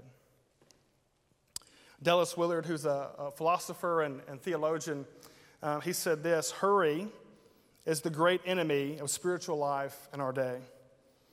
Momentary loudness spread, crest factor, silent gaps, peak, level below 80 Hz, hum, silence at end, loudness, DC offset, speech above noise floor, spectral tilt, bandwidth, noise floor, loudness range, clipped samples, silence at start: 13 LU; 22 dB; none; -12 dBFS; -78 dBFS; none; 0.65 s; -32 LUFS; under 0.1%; 41 dB; -4 dB/octave; 16.5 kHz; -73 dBFS; 3 LU; under 0.1%; 0.05 s